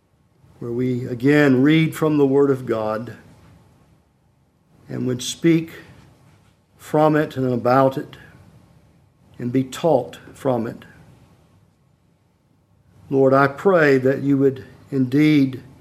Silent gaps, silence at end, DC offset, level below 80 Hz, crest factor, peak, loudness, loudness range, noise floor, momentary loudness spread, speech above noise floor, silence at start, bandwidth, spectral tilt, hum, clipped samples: none; 0.2 s; under 0.1%; -60 dBFS; 20 dB; -2 dBFS; -19 LUFS; 7 LU; -60 dBFS; 16 LU; 42 dB; 0.6 s; 15 kHz; -7 dB/octave; none; under 0.1%